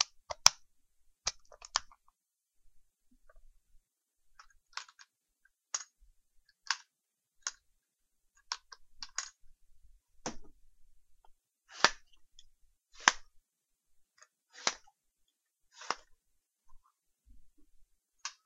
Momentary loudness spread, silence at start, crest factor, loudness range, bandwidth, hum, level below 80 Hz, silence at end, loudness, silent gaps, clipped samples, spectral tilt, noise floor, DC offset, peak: 22 LU; 0 s; 42 dB; 14 LU; 14 kHz; none; -64 dBFS; 0.15 s; -34 LUFS; none; under 0.1%; 1 dB/octave; -86 dBFS; under 0.1%; 0 dBFS